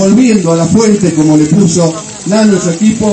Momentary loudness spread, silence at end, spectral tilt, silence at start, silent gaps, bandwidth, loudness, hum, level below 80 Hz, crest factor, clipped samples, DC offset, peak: 5 LU; 0 s; -6 dB/octave; 0 s; none; 8.8 kHz; -9 LUFS; none; -40 dBFS; 8 dB; 0.4%; under 0.1%; 0 dBFS